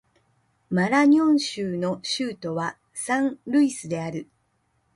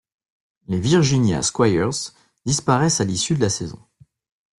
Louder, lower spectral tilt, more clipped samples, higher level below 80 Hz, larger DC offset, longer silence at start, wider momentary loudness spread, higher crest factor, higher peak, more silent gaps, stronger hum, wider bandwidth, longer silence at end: second, -24 LUFS vs -20 LUFS; about the same, -5 dB/octave vs -4.5 dB/octave; neither; second, -66 dBFS vs -50 dBFS; neither; about the same, 0.7 s vs 0.7 s; about the same, 13 LU vs 11 LU; about the same, 16 dB vs 18 dB; second, -8 dBFS vs -4 dBFS; neither; neither; about the same, 11.5 kHz vs 12 kHz; about the same, 0.75 s vs 0.85 s